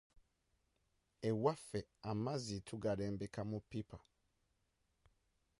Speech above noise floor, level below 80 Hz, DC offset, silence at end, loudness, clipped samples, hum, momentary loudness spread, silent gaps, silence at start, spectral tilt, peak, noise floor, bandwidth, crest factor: 41 dB; -68 dBFS; under 0.1%; 1.6 s; -43 LUFS; under 0.1%; none; 11 LU; none; 1.2 s; -6.5 dB/octave; -22 dBFS; -83 dBFS; 11.5 kHz; 22 dB